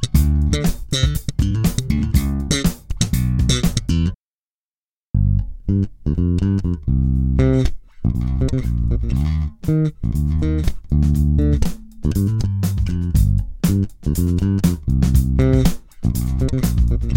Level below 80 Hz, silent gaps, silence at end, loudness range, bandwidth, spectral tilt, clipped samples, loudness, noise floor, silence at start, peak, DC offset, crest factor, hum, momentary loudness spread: -22 dBFS; 4.15-5.14 s; 0 s; 3 LU; 17 kHz; -6.5 dB/octave; under 0.1%; -19 LUFS; under -90 dBFS; 0 s; -2 dBFS; under 0.1%; 16 dB; none; 6 LU